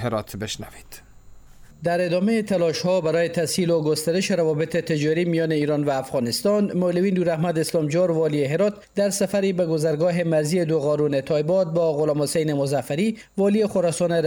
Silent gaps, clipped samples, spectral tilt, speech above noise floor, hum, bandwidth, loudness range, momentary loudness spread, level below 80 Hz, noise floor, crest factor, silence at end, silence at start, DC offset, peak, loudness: none; under 0.1%; -5.5 dB/octave; 23 dB; none; over 20 kHz; 1 LU; 3 LU; -56 dBFS; -45 dBFS; 10 dB; 0 s; 0 s; under 0.1%; -10 dBFS; -22 LUFS